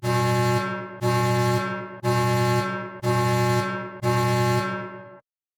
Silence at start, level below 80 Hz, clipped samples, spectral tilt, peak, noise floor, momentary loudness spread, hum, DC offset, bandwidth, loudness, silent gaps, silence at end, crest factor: 0 s; -58 dBFS; under 0.1%; -6 dB/octave; -10 dBFS; -50 dBFS; 8 LU; none; under 0.1%; 17.5 kHz; -24 LUFS; none; 0.4 s; 14 dB